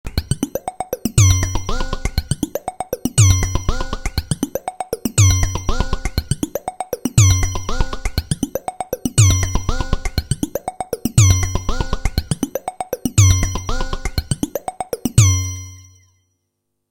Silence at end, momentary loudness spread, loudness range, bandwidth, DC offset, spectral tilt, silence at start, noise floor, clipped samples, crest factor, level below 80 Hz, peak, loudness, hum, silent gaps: 1.1 s; 13 LU; 2 LU; 17 kHz; under 0.1%; -4.5 dB/octave; 0.05 s; -74 dBFS; under 0.1%; 18 dB; -26 dBFS; 0 dBFS; -19 LUFS; none; none